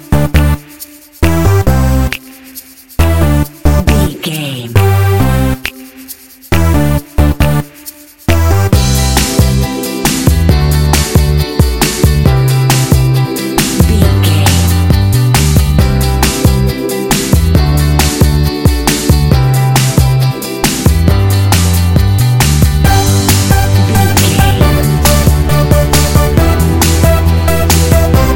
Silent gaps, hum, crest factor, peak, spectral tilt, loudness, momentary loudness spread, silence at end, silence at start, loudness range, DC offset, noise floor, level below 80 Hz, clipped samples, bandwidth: none; none; 10 dB; 0 dBFS; -5 dB/octave; -10 LUFS; 7 LU; 0 s; 0 s; 4 LU; under 0.1%; -32 dBFS; -16 dBFS; 0.2%; 17.5 kHz